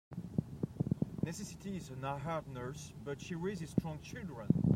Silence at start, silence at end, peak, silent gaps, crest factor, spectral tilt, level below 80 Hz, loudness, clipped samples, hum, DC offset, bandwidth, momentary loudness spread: 0.1 s; 0 s; -14 dBFS; none; 24 dB; -7 dB/octave; -60 dBFS; -40 LUFS; under 0.1%; none; under 0.1%; 15.5 kHz; 8 LU